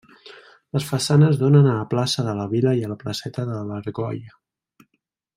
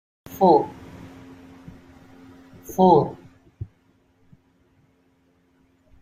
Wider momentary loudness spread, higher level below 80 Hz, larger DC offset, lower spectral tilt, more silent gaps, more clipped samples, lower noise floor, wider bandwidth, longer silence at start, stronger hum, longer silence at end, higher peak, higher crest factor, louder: second, 13 LU vs 28 LU; about the same, -60 dBFS vs -58 dBFS; neither; second, -6.5 dB/octave vs -8 dB/octave; neither; neither; first, -74 dBFS vs -63 dBFS; about the same, 15 kHz vs 15.5 kHz; about the same, 0.25 s vs 0.3 s; neither; second, 1.05 s vs 2.35 s; about the same, -4 dBFS vs -2 dBFS; about the same, 18 dB vs 22 dB; about the same, -21 LUFS vs -19 LUFS